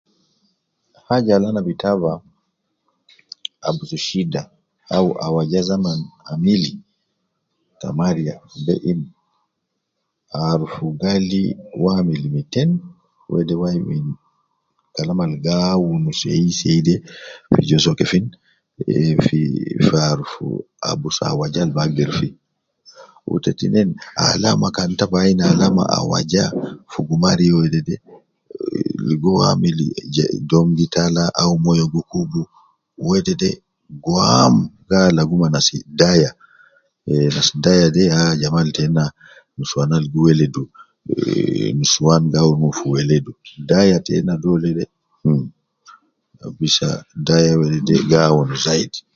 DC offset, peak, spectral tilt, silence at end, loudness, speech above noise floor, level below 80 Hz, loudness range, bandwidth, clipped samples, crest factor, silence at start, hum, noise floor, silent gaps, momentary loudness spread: under 0.1%; 0 dBFS; -5.5 dB/octave; 0.15 s; -17 LUFS; 59 dB; -46 dBFS; 6 LU; 7.6 kHz; under 0.1%; 18 dB; 1.1 s; none; -75 dBFS; none; 13 LU